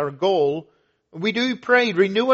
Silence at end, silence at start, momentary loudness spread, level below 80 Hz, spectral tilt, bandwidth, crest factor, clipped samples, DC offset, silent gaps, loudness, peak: 0 s; 0 s; 8 LU; -68 dBFS; -2.5 dB/octave; 7.8 kHz; 18 dB; under 0.1%; under 0.1%; none; -20 LUFS; -2 dBFS